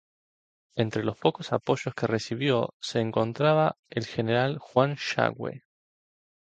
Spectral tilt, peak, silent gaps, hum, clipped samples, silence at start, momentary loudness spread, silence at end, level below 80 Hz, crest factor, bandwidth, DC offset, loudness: -6 dB/octave; -6 dBFS; 2.73-2.80 s, 3.79-3.83 s; none; under 0.1%; 0.75 s; 8 LU; 0.95 s; -64 dBFS; 22 dB; 9 kHz; under 0.1%; -27 LUFS